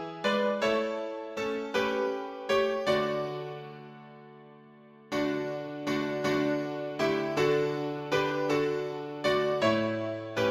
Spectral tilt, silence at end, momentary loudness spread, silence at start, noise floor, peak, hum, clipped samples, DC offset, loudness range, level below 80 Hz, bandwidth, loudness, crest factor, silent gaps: -5.5 dB/octave; 0 s; 9 LU; 0 s; -54 dBFS; -14 dBFS; none; under 0.1%; under 0.1%; 5 LU; -66 dBFS; 15.5 kHz; -30 LUFS; 16 dB; none